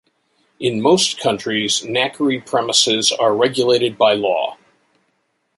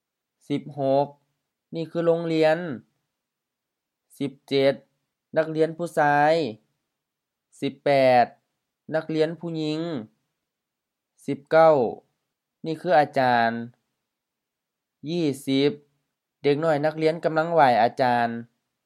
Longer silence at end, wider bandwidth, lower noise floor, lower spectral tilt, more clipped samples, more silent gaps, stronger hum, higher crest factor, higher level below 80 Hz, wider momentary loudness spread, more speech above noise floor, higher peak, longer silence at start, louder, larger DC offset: first, 1.05 s vs 0.4 s; second, 11.5 kHz vs 13.5 kHz; second, -67 dBFS vs -85 dBFS; second, -2.5 dB/octave vs -6.5 dB/octave; neither; neither; neither; about the same, 18 dB vs 20 dB; first, -62 dBFS vs -78 dBFS; second, 6 LU vs 16 LU; second, 50 dB vs 62 dB; first, 0 dBFS vs -4 dBFS; about the same, 0.6 s vs 0.5 s; first, -16 LUFS vs -23 LUFS; neither